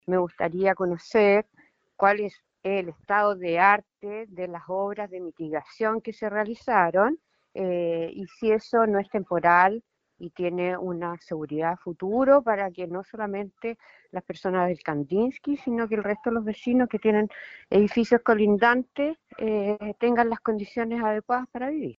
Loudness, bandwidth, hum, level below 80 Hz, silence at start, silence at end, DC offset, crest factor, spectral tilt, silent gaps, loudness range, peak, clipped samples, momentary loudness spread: -25 LUFS; 7.4 kHz; none; -62 dBFS; 0.1 s; 0.05 s; under 0.1%; 20 dB; -5 dB/octave; none; 4 LU; -6 dBFS; under 0.1%; 15 LU